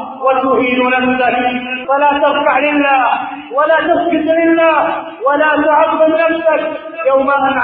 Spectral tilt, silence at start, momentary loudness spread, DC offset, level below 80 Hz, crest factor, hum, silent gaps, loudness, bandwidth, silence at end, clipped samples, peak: -10 dB/octave; 0 s; 6 LU; under 0.1%; -52 dBFS; 12 dB; none; none; -12 LUFS; 4.4 kHz; 0 s; under 0.1%; 0 dBFS